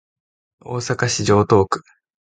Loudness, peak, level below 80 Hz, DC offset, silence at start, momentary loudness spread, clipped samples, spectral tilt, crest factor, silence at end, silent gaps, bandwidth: -18 LUFS; -2 dBFS; -44 dBFS; under 0.1%; 0.65 s; 13 LU; under 0.1%; -5 dB/octave; 18 dB; 0.45 s; none; 9.6 kHz